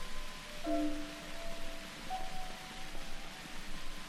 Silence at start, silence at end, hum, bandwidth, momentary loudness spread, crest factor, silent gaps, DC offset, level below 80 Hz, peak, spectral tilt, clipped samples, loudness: 0 s; 0 s; none; 14.5 kHz; 10 LU; 16 dB; none; under 0.1%; -44 dBFS; -22 dBFS; -3.5 dB/octave; under 0.1%; -43 LUFS